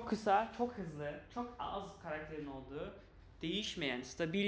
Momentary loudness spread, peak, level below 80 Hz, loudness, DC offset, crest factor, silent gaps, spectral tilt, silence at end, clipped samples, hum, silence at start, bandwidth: 13 LU; -20 dBFS; -62 dBFS; -40 LUFS; under 0.1%; 20 dB; none; -5 dB/octave; 0 s; under 0.1%; none; 0 s; 8 kHz